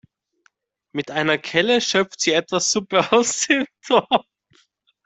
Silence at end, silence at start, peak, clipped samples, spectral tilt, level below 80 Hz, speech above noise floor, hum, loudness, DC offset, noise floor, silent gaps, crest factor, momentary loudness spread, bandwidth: 0.85 s; 0.95 s; -2 dBFS; under 0.1%; -2.5 dB/octave; -64 dBFS; 44 dB; none; -19 LUFS; under 0.1%; -64 dBFS; none; 20 dB; 5 LU; 8.4 kHz